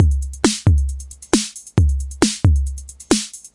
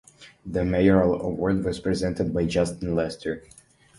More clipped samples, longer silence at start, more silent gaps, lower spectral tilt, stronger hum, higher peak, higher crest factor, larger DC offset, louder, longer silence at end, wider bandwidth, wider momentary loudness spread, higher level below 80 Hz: neither; second, 0 s vs 0.2 s; neither; second, -5 dB/octave vs -7 dB/octave; neither; first, 0 dBFS vs -6 dBFS; about the same, 18 dB vs 18 dB; neither; first, -19 LUFS vs -24 LUFS; second, 0.05 s vs 0.6 s; about the same, 11.5 kHz vs 11.5 kHz; second, 10 LU vs 13 LU; first, -24 dBFS vs -42 dBFS